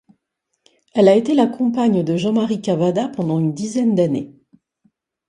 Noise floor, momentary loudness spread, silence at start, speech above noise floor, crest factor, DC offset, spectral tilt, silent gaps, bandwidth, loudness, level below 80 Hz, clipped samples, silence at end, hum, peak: -75 dBFS; 8 LU; 0.95 s; 58 dB; 18 dB; under 0.1%; -7 dB/octave; none; 10.5 kHz; -18 LUFS; -62 dBFS; under 0.1%; 1 s; none; 0 dBFS